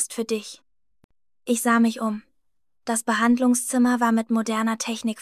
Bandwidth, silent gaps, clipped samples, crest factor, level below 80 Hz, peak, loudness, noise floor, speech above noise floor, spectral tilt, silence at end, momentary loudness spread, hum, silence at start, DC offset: 14.5 kHz; 1.04-1.09 s; under 0.1%; 16 dB; -72 dBFS; -8 dBFS; -22 LUFS; -77 dBFS; 55 dB; -3.5 dB/octave; 0 s; 11 LU; none; 0 s; under 0.1%